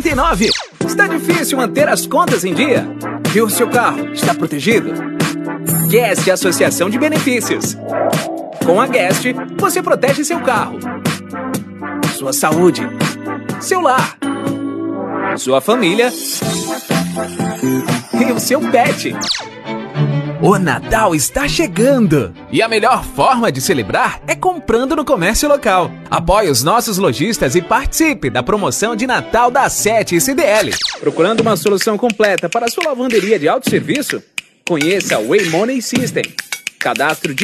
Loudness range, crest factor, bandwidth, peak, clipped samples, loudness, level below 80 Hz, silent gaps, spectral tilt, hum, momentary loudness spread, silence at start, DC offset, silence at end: 3 LU; 14 dB; 14.5 kHz; 0 dBFS; under 0.1%; -15 LUFS; -36 dBFS; none; -4 dB/octave; none; 8 LU; 0 s; under 0.1%; 0 s